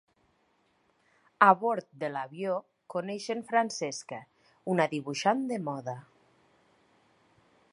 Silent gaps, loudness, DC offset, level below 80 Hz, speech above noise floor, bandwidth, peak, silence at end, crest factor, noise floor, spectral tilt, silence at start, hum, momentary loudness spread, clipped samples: none; -30 LUFS; under 0.1%; -82 dBFS; 41 dB; 11.5 kHz; -6 dBFS; 1.7 s; 26 dB; -71 dBFS; -4.5 dB/octave; 1.4 s; none; 17 LU; under 0.1%